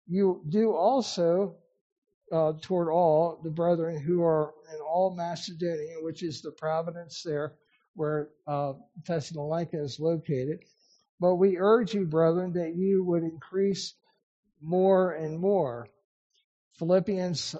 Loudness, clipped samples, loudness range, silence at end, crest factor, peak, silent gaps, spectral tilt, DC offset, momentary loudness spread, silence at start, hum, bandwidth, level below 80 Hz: -28 LUFS; under 0.1%; 7 LU; 0 s; 18 dB; -10 dBFS; 1.81-2.02 s, 2.14-2.21 s, 7.88-7.94 s, 11.09-11.18 s, 14.23-14.43 s, 16.04-16.30 s, 16.44-16.71 s; -6.5 dB/octave; under 0.1%; 12 LU; 0.1 s; none; 8 kHz; -72 dBFS